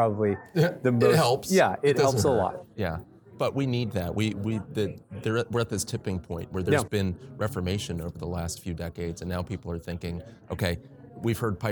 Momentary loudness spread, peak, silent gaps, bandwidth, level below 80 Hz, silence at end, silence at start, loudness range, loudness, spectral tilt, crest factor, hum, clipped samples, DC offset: 12 LU; -8 dBFS; none; 19 kHz; -50 dBFS; 0 s; 0 s; 9 LU; -28 LUFS; -5.5 dB/octave; 20 dB; none; under 0.1%; under 0.1%